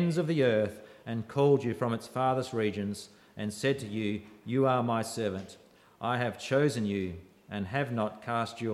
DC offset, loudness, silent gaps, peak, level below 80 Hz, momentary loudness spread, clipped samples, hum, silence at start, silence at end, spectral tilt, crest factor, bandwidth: under 0.1%; -31 LUFS; none; -14 dBFS; -68 dBFS; 13 LU; under 0.1%; none; 0 s; 0 s; -6.5 dB/octave; 18 dB; 14.5 kHz